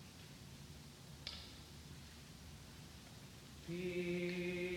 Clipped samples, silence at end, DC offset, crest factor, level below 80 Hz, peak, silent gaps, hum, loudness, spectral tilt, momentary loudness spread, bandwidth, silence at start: under 0.1%; 0 s; under 0.1%; 20 dB; -64 dBFS; -26 dBFS; none; none; -48 LUFS; -5 dB/octave; 15 LU; 18 kHz; 0 s